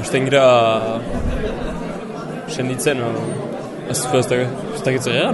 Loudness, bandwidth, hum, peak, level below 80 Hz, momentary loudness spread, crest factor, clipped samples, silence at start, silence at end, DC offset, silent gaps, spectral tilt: -19 LUFS; 12 kHz; none; -2 dBFS; -34 dBFS; 15 LU; 18 dB; under 0.1%; 0 s; 0 s; under 0.1%; none; -4.5 dB/octave